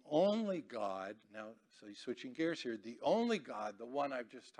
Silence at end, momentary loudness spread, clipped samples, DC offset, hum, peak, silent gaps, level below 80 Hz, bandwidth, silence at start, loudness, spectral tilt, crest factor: 0.1 s; 17 LU; under 0.1%; under 0.1%; none; -20 dBFS; none; -88 dBFS; 10 kHz; 0.05 s; -39 LUFS; -5.5 dB/octave; 18 dB